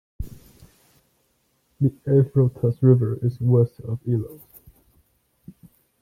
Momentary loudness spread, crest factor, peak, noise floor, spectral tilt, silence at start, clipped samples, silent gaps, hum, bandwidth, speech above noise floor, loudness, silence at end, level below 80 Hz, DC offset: 20 LU; 20 dB; -4 dBFS; -68 dBFS; -11.5 dB/octave; 0.2 s; under 0.1%; none; none; 14.5 kHz; 48 dB; -21 LUFS; 1.65 s; -48 dBFS; under 0.1%